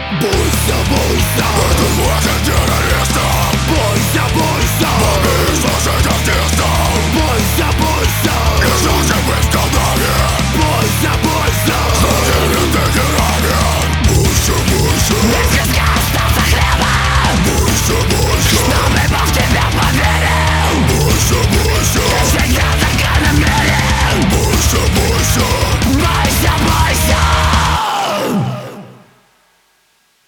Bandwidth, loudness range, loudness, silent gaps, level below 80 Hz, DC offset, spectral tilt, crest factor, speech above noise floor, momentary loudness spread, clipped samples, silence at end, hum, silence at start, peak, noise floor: over 20 kHz; 1 LU; -12 LUFS; none; -18 dBFS; under 0.1%; -4 dB/octave; 12 dB; 43 dB; 2 LU; under 0.1%; 1.35 s; none; 0 s; 0 dBFS; -56 dBFS